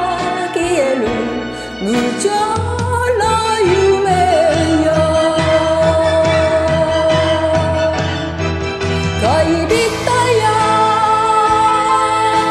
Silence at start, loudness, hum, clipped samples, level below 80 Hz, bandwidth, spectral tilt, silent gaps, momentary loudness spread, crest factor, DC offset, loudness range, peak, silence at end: 0 s; -14 LUFS; none; under 0.1%; -34 dBFS; 13.5 kHz; -5 dB/octave; none; 6 LU; 12 dB; under 0.1%; 3 LU; 0 dBFS; 0 s